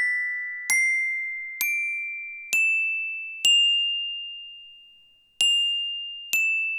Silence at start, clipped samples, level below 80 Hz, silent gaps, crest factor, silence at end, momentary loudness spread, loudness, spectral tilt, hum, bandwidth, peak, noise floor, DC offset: 0 s; under 0.1%; -78 dBFS; none; 20 dB; 0 s; 13 LU; -22 LUFS; 5 dB/octave; none; over 20 kHz; -6 dBFS; -57 dBFS; under 0.1%